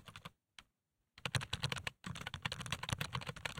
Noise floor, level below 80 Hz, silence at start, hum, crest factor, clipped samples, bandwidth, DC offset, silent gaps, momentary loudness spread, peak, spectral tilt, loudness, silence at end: -86 dBFS; -60 dBFS; 0 s; none; 28 dB; under 0.1%; 16.5 kHz; under 0.1%; none; 18 LU; -18 dBFS; -3.5 dB/octave; -42 LUFS; 0 s